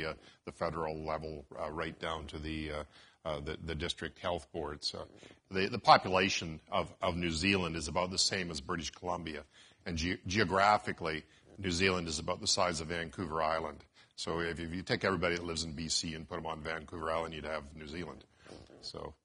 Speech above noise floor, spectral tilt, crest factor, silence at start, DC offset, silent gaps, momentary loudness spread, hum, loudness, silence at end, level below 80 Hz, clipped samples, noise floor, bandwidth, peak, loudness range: 19 dB; -3.5 dB/octave; 28 dB; 0 s; under 0.1%; none; 14 LU; none; -34 LUFS; 0.1 s; -54 dBFS; under 0.1%; -55 dBFS; 11 kHz; -8 dBFS; 8 LU